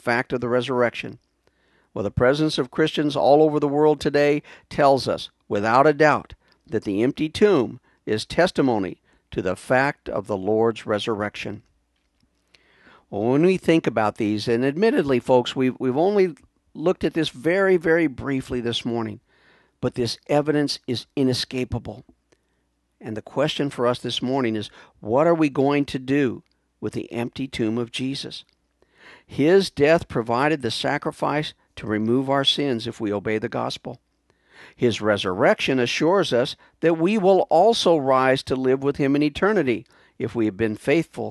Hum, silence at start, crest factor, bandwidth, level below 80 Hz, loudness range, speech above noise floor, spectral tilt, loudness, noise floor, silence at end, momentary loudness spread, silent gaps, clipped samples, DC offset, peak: none; 0.05 s; 20 dB; 12.5 kHz; -52 dBFS; 6 LU; 49 dB; -5.5 dB/octave; -22 LUFS; -70 dBFS; 0 s; 12 LU; none; under 0.1%; under 0.1%; -2 dBFS